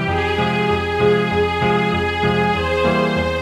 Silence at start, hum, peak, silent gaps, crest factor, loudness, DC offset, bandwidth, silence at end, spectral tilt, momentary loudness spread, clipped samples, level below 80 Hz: 0 s; none; -4 dBFS; none; 12 dB; -17 LUFS; under 0.1%; 13 kHz; 0 s; -6.5 dB/octave; 2 LU; under 0.1%; -36 dBFS